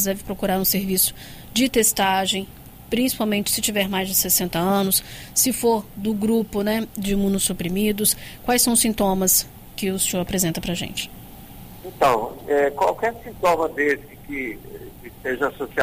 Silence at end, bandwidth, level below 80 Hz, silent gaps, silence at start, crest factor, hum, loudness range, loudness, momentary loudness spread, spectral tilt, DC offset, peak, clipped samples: 0 s; 16 kHz; -44 dBFS; none; 0 s; 16 dB; none; 3 LU; -21 LUFS; 14 LU; -3 dB/octave; under 0.1%; -6 dBFS; under 0.1%